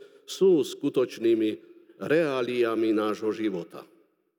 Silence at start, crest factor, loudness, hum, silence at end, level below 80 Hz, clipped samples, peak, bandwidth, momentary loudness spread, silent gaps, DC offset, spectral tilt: 0.3 s; 16 dB; -26 LUFS; none; 0.55 s; under -90 dBFS; under 0.1%; -10 dBFS; 17 kHz; 16 LU; none; under 0.1%; -5.5 dB/octave